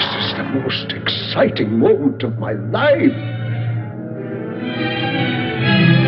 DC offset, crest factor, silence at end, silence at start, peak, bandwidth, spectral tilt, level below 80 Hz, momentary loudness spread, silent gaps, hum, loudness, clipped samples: under 0.1%; 16 dB; 0 s; 0 s; 0 dBFS; 5.8 kHz; -9.5 dB/octave; -52 dBFS; 11 LU; none; none; -18 LUFS; under 0.1%